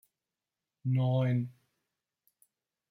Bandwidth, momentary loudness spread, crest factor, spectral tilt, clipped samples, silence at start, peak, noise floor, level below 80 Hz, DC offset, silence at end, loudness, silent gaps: 4.1 kHz; 12 LU; 14 dB; -9.5 dB/octave; under 0.1%; 0.85 s; -20 dBFS; under -90 dBFS; -76 dBFS; under 0.1%; 1.4 s; -31 LUFS; none